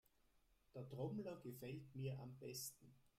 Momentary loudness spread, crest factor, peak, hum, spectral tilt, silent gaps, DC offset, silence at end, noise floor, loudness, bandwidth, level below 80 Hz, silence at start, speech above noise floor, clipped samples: 9 LU; 18 dB; -36 dBFS; none; -5.5 dB/octave; none; under 0.1%; 0.1 s; -78 dBFS; -52 LUFS; 16 kHz; -80 dBFS; 0.35 s; 27 dB; under 0.1%